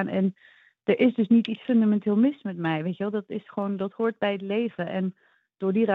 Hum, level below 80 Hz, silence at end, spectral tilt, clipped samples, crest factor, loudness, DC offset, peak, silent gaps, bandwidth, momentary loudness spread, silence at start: none; -76 dBFS; 0 s; -9.5 dB/octave; under 0.1%; 16 dB; -26 LUFS; under 0.1%; -8 dBFS; none; 5 kHz; 9 LU; 0 s